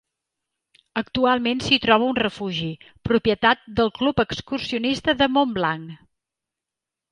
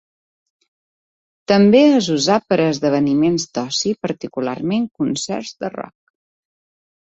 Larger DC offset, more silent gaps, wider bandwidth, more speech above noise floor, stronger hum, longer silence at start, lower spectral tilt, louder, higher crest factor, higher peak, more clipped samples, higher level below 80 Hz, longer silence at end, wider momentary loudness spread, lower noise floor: neither; neither; first, 11 kHz vs 8 kHz; second, 65 dB vs over 73 dB; neither; second, 0.95 s vs 1.5 s; about the same, -5 dB/octave vs -5 dB/octave; second, -21 LUFS vs -17 LUFS; about the same, 20 dB vs 16 dB; about the same, -2 dBFS vs -2 dBFS; neither; first, -50 dBFS vs -58 dBFS; about the same, 1.15 s vs 1.15 s; second, 11 LU vs 15 LU; about the same, -87 dBFS vs under -90 dBFS